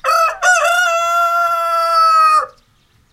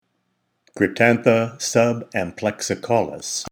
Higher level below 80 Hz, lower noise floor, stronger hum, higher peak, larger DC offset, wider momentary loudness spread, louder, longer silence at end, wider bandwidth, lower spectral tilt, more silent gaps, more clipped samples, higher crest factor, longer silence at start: first, -54 dBFS vs -62 dBFS; second, -55 dBFS vs -71 dBFS; neither; about the same, -2 dBFS vs -2 dBFS; neither; second, 5 LU vs 9 LU; first, -13 LUFS vs -20 LUFS; first, 0.65 s vs 0.05 s; second, 16 kHz vs over 20 kHz; second, 2 dB/octave vs -4.5 dB/octave; neither; neither; second, 12 dB vs 20 dB; second, 0.05 s vs 0.75 s